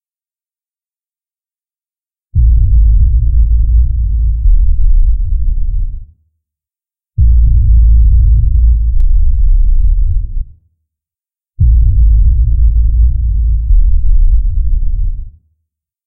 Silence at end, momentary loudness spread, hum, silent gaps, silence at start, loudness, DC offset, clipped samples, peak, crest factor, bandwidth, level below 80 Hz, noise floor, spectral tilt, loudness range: 0 s; 10 LU; none; none; 0 s; -13 LUFS; under 0.1%; under 0.1%; 0 dBFS; 8 dB; 0.4 kHz; -10 dBFS; under -90 dBFS; -13.5 dB/octave; 4 LU